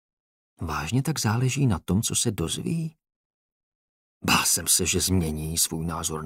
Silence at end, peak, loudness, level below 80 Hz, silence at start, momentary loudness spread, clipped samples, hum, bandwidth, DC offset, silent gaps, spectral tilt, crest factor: 0 s; -6 dBFS; -24 LUFS; -46 dBFS; 0.6 s; 11 LU; under 0.1%; none; 16 kHz; under 0.1%; 3.16-4.21 s; -3.5 dB/octave; 20 dB